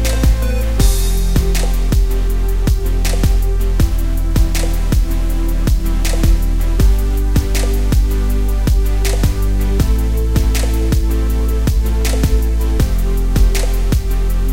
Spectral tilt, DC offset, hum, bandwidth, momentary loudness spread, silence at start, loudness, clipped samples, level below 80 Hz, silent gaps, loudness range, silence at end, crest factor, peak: -5.5 dB/octave; 4%; none; 16.5 kHz; 3 LU; 0 s; -17 LUFS; under 0.1%; -14 dBFS; none; 1 LU; 0 s; 12 dB; -2 dBFS